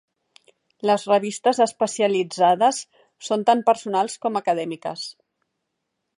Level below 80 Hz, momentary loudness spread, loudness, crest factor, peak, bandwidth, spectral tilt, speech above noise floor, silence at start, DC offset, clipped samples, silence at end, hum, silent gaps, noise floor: -76 dBFS; 12 LU; -21 LUFS; 18 dB; -4 dBFS; 11.5 kHz; -4 dB/octave; 57 dB; 0.85 s; under 0.1%; under 0.1%; 1.05 s; none; none; -78 dBFS